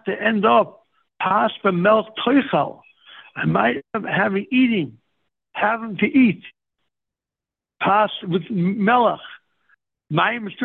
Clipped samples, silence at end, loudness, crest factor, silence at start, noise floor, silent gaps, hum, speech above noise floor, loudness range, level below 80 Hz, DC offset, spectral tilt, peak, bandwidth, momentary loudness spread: under 0.1%; 0 s; -19 LUFS; 16 dB; 0.05 s; -88 dBFS; none; none; 69 dB; 2 LU; -62 dBFS; under 0.1%; -9.5 dB/octave; -4 dBFS; 4.2 kHz; 10 LU